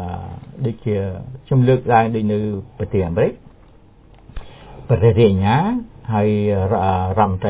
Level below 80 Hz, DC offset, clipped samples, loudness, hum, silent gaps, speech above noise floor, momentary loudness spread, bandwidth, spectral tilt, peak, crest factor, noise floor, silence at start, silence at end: -36 dBFS; under 0.1%; under 0.1%; -18 LUFS; none; none; 30 dB; 15 LU; 4 kHz; -12 dB/octave; -2 dBFS; 16 dB; -46 dBFS; 0 s; 0 s